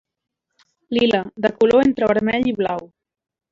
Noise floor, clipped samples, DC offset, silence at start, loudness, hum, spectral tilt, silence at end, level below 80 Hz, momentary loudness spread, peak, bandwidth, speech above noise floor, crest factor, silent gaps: -63 dBFS; under 0.1%; under 0.1%; 0.9 s; -18 LUFS; none; -6.5 dB/octave; 0.65 s; -52 dBFS; 9 LU; -4 dBFS; 7.6 kHz; 46 dB; 16 dB; none